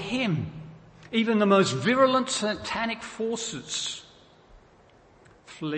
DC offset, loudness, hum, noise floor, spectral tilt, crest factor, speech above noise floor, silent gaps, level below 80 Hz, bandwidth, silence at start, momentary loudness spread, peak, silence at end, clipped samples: under 0.1%; -26 LUFS; none; -56 dBFS; -4.5 dB/octave; 18 dB; 31 dB; none; -60 dBFS; 8.8 kHz; 0 s; 16 LU; -8 dBFS; 0 s; under 0.1%